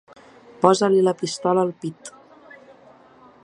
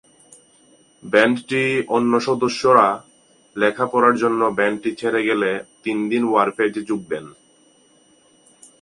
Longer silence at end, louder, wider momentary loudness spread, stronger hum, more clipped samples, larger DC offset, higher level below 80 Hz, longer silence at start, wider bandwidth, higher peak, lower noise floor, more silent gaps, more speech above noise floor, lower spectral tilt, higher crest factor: second, 1.35 s vs 1.5 s; about the same, -20 LUFS vs -19 LUFS; first, 19 LU vs 11 LU; neither; neither; neither; about the same, -68 dBFS vs -64 dBFS; second, 0.6 s vs 1.05 s; about the same, 11 kHz vs 11.5 kHz; about the same, 0 dBFS vs 0 dBFS; second, -50 dBFS vs -55 dBFS; neither; second, 31 dB vs 37 dB; about the same, -5.5 dB/octave vs -5 dB/octave; about the same, 22 dB vs 20 dB